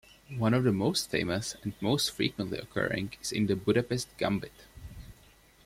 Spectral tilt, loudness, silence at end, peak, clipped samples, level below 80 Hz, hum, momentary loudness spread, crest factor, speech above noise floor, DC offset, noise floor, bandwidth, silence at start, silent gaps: -5 dB/octave; -30 LUFS; 0.55 s; -12 dBFS; under 0.1%; -56 dBFS; none; 20 LU; 18 dB; 29 dB; under 0.1%; -59 dBFS; 16.5 kHz; 0.3 s; none